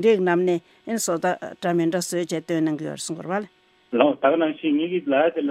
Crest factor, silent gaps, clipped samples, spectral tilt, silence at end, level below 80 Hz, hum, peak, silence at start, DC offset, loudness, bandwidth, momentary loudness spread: 20 dB; none; under 0.1%; -5 dB/octave; 0 s; -74 dBFS; none; -4 dBFS; 0 s; under 0.1%; -23 LUFS; 16 kHz; 10 LU